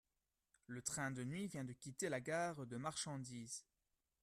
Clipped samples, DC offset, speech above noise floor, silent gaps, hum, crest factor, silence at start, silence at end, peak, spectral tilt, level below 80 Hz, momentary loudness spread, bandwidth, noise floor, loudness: under 0.1%; under 0.1%; over 44 dB; none; none; 20 dB; 0.7 s; 0.6 s; -28 dBFS; -4 dB/octave; -78 dBFS; 8 LU; 15 kHz; under -90 dBFS; -46 LUFS